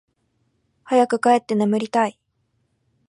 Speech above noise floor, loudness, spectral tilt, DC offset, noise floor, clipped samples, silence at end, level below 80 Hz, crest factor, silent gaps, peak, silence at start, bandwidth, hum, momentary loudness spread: 51 dB; -20 LUFS; -5.5 dB/octave; under 0.1%; -69 dBFS; under 0.1%; 1 s; -74 dBFS; 18 dB; none; -4 dBFS; 0.9 s; 11.5 kHz; none; 5 LU